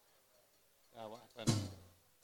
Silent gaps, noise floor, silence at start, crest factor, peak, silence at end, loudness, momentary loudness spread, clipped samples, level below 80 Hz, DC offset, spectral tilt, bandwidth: none; -71 dBFS; 0.95 s; 26 dB; -20 dBFS; 0.35 s; -42 LUFS; 21 LU; under 0.1%; -68 dBFS; under 0.1%; -5 dB/octave; 19 kHz